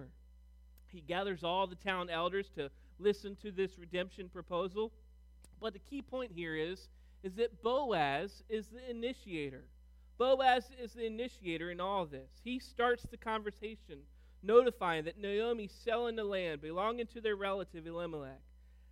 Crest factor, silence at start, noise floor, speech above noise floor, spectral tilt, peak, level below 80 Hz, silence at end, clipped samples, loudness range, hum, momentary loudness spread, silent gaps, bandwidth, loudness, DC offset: 24 dB; 0 s; -60 dBFS; 23 dB; -5.5 dB/octave; -14 dBFS; -60 dBFS; 0 s; under 0.1%; 6 LU; none; 14 LU; none; 13.5 kHz; -37 LUFS; under 0.1%